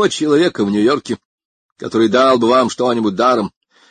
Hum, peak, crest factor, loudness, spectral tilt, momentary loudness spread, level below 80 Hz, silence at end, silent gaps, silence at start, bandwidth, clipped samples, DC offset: none; -2 dBFS; 14 dB; -14 LUFS; -5 dB/octave; 14 LU; -56 dBFS; 0.4 s; 1.25-1.38 s, 1.45-1.76 s; 0 s; 9.6 kHz; under 0.1%; under 0.1%